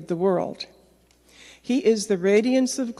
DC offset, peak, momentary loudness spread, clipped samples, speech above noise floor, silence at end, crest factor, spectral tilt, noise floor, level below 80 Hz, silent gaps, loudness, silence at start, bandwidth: under 0.1%; -8 dBFS; 18 LU; under 0.1%; 36 dB; 0.05 s; 16 dB; -5 dB/octave; -58 dBFS; -64 dBFS; none; -22 LUFS; 0 s; 12.5 kHz